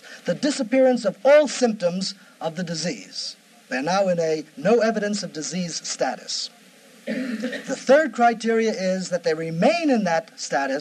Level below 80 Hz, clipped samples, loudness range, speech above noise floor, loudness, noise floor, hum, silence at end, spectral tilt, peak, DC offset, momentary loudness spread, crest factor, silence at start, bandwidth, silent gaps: -76 dBFS; under 0.1%; 4 LU; 28 dB; -22 LUFS; -50 dBFS; none; 0 s; -4.5 dB/octave; -4 dBFS; under 0.1%; 12 LU; 18 dB; 0.05 s; 13 kHz; none